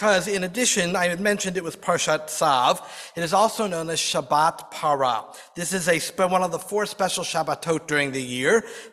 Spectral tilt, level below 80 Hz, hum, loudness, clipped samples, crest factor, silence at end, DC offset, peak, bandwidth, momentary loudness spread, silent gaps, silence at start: -3 dB/octave; -62 dBFS; none; -23 LUFS; under 0.1%; 18 dB; 0.05 s; under 0.1%; -6 dBFS; 15.5 kHz; 7 LU; none; 0 s